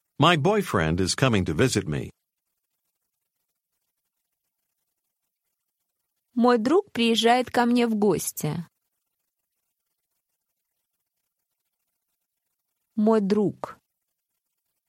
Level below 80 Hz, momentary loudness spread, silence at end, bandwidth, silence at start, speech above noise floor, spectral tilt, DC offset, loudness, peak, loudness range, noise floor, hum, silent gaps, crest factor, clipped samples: -54 dBFS; 13 LU; 1.15 s; 16 kHz; 0.2 s; 59 dB; -5 dB/octave; under 0.1%; -23 LUFS; -4 dBFS; 12 LU; -81 dBFS; none; none; 24 dB; under 0.1%